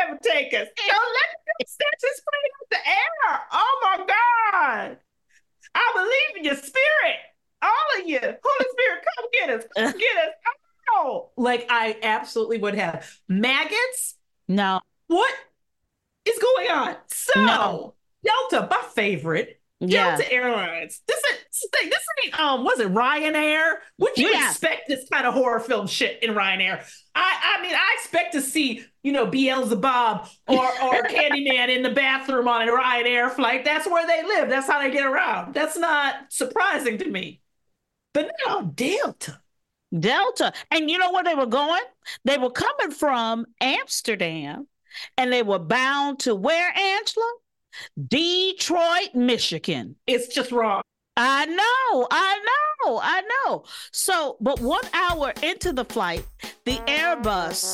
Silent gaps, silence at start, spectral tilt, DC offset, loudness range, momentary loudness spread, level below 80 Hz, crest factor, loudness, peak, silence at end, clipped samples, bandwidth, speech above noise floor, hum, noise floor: none; 0 s; -3 dB/octave; under 0.1%; 4 LU; 9 LU; -54 dBFS; 18 dB; -22 LUFS; -4 dBFS; 0 s; under 0.1%; 16 kHz; 54 dB; none; -76 dBFS